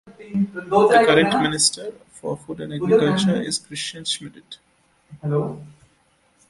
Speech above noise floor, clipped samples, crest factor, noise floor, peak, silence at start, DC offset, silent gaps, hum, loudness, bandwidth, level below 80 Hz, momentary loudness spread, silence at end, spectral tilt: 41 dB; under 0.1%; 20 dB; -61 dBFS; -2 dBFS; 0.05 s; under 0.1%; none; none; -20 LUFS; 11.5 kHz; -56 dBFS; 18 LU; 0.8 s; -4 dB/octave